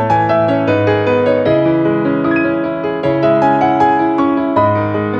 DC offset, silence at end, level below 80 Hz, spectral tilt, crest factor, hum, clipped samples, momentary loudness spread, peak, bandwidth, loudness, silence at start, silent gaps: under 0.1%; 0 s; -46 dBFS; -8.5 dB/octave; 12 dB; none; under 0.1%; 4 LU; 0 dBFS; 7 kHz; -13 LUFS; 0 s; none